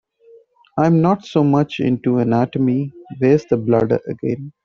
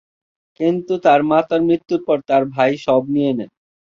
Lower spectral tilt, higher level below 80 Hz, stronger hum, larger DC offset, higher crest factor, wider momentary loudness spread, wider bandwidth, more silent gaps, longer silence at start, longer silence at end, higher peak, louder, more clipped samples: first, -9 dB/octave vs -7.5 dB/octave; first, -54 dBFS vs -60 dBFS; neither; neither; about the same, 16 dB vs 16 dB; about the same, 9 LU vs 7 LU; about the same, 7.2 kHz vs 7.2 kHz; neither; first, 0.75 s vs 0.6 s; second, 0.15 s vs 0.5 s; about the same, -2 dBFS vs -2 dBFS; about the same, -17 LUFS vs -17 LUFS; neither